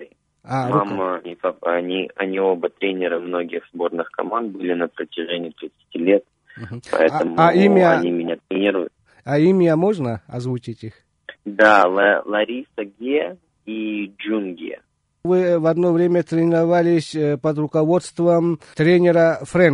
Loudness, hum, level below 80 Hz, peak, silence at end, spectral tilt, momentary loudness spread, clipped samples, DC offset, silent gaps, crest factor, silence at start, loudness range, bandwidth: -19 LUFS; none; -62 dBFS; 0 dBFS; 0 s; -7 dB/octave; 16 LU; under 0.1%; under 0.1%; none; 18 dB; 0 s; 6 LU; 10.5 kHz